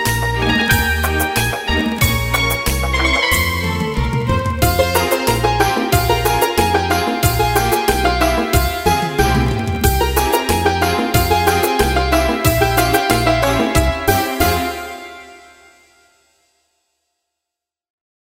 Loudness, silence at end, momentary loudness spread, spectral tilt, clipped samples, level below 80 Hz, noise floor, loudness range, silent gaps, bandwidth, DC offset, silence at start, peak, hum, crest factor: -15 LUFS; 3 s; 4 LU; -4.5 dB/octave; under 0.1%; -26 dBFS; -84 dBFS; 4 LU; none; 16.5 kHz; under 0.1%; 0 s; 0 dBFS; none; 16 dB